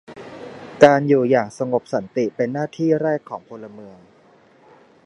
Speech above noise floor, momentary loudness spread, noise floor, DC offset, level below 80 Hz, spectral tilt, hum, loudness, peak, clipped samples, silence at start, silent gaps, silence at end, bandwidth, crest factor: 34 dB; 23 LU; -52 dBFS; under 0.1%; -64 dBFS; -7 dB/octave; none; -19 LUFS; 0 dBFS; under 0.1%; 0.1 s; none; 1.15 s; 11 kHz; 20 dB